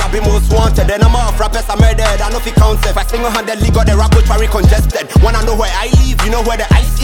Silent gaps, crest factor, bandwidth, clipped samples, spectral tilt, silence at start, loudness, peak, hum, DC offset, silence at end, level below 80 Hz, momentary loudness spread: none; 10 dB; 17.5 kHz; under 0.1%; -5.5 dB/octave; 0 s; -12 LUFS; 0 dBFS; none; under 0.1%; 0 s; -12 dBFS; 4 LU